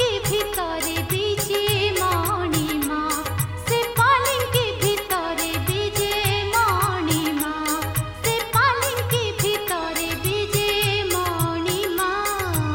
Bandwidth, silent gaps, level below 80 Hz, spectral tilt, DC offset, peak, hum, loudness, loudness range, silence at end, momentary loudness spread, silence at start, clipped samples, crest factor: 17 kHz; none; -42 dBFS; -3.5 dB/octave; under 0.1%; -6 dBFS; none; -22 LUFS; 1 LU; 0 s; 5 LU; 0 s; under 0.1%; 16 dB